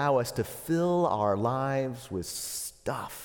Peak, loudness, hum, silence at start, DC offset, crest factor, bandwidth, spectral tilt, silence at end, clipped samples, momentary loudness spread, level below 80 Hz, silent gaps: -14 dBFS; -30 LUFS; none; 0 s; under 0.1%; 16 dB; 18 kHz; -5.5 dB/octave; 0 s; under 0.1%; 9 LU; -58 dBFS; none